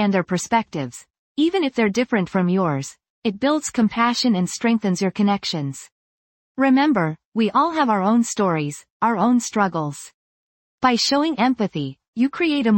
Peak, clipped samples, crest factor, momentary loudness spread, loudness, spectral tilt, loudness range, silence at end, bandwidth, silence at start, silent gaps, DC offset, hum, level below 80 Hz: -4 dBFS; under 0.1%; 16 dB; 11 LU; -20 LUFS; -5 dB/octave; 2 LU; 0 s; 17 kHz; 0 s; 1.10-1.35 s, 3.10-3.22 s, 5.92-6.55 s, 7.25-7.32 s, 8.90-9.00 s, 10.14-10.78 s, 12.08-12.13 s; under 0.1%; none; -60 dBFS